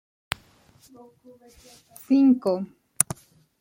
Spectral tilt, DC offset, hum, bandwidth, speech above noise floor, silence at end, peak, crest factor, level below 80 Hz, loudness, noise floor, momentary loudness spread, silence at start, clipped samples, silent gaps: -4 dB/octave; under 0.1%; none; 16.5 kHz; 32 dB; 0.5 s; 0 dBFS; 26 dB; -64 dBFS; -23 LUFS; -57 dBFS; 17 LU; 2.1 s; under 0.1%; none